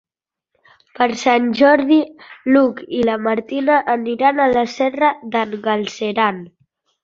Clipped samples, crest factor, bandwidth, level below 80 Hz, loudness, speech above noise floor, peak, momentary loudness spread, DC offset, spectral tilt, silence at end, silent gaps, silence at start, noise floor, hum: under 0.1%; 16 dB; 7.6 kHz; -58 dBFS; -17 LUFS; 70 dB; -2 dBFS; 8 LU; under 0.1%; -5 dB/octave; 0.55 s; none; 1 s; -87 dBFS; none